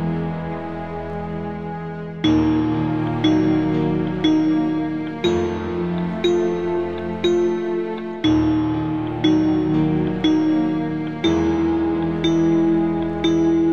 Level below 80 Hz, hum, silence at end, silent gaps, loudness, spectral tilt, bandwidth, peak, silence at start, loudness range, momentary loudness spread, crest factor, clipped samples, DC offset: -42 dBFS; none; 0 s; none; -20 LUFS; -7.5 dB/octave; 7.2 kHz; -6 dBFS; 0 s; 2 LU; 10 LU; 14 dB; under 0.1%; 0.5%